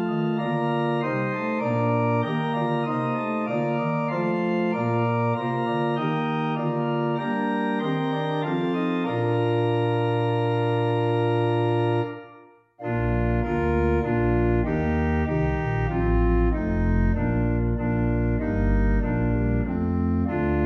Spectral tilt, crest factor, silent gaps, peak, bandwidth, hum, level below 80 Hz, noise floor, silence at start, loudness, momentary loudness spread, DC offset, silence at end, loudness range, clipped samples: -9.5 dB/octave; 12 dB; none; -10 dBFS; 7.2 kHz; none; -32 dBFS; -51 dBFS; 0 s; -24 LUFS; 3 LU; under 0.1%; 0 s; 1 LU; under 0.1%